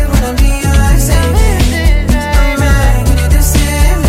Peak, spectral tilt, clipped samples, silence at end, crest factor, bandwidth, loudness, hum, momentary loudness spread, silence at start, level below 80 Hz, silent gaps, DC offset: 0 dBFS; -5 dB/octave; under 0.1%; 0 s; 8 dB; 16 kHz; -11 LUFS; none; 2 LU; 0 s; -10 dBFS; none; under 0.1%